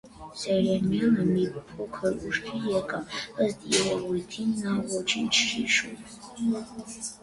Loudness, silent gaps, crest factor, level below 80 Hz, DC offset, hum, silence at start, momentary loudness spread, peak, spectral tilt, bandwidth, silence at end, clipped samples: -27 LUFS; none; 18 dB; -58 dBFS; under 0.1%; none; 0.05 s; 13 LU; -10 dBFS; -4 dB/octave; 11.5 kHz; 0.05 s; under 0.1%